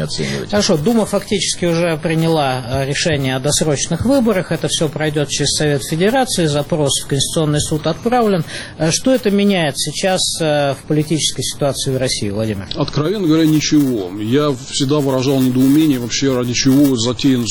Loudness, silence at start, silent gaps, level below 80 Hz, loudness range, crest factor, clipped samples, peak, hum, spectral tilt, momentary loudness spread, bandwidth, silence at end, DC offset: -16 LUFS; 0 s; none; -40 dBFS; 2 LU; 12 dB; under 0.1%; -4 dBFS; none; -4.5 dB/octave; 5 LU; 19 kHz; 0 s; under 0.1%